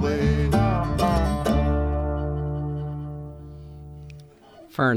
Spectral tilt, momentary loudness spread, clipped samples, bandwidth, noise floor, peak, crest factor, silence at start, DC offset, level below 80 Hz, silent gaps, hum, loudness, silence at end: -7.5 dB/octave; 20 LU; under 0.1%; 14 kHz; -48 dBFS; -8 dBFS; 16 dB; 0 s; under 0.1%; -30 dBFS; none; none; -24 LUFS; 0 s